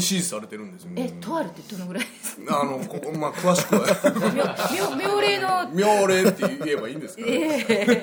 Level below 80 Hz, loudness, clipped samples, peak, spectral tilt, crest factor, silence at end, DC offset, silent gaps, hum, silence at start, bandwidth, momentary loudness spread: -68 dBFS; -23 LUFS; under 0.1%; -6 dBFS; -4 dB/octave; 18 dB; 0 s; under 0.1%; none; none; 0 s; over 20 kHz; 13 LU